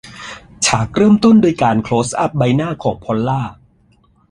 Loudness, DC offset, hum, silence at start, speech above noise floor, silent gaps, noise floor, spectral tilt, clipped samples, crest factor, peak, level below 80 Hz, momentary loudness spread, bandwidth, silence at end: -15 LUFS; under 0.1%; none; 0.05 s; 40 dB; none; -53 dBFS; -5.5 dB/octave; under 0.1%; 14 dB; 0 dBFS; -44 dBFS; 15 LU; 11.5 kHz; 0.8 s